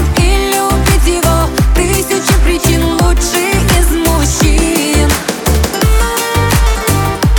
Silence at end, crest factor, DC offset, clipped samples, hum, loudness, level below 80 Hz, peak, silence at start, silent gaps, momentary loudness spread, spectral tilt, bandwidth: 0 s; 10 dB; under 0.1%; under 0.1%; none; -11 LUFS; -14 dBFS; 0 dBFS; 0 s; none; 2 LU; -4.5 dB/octave; 20 kHz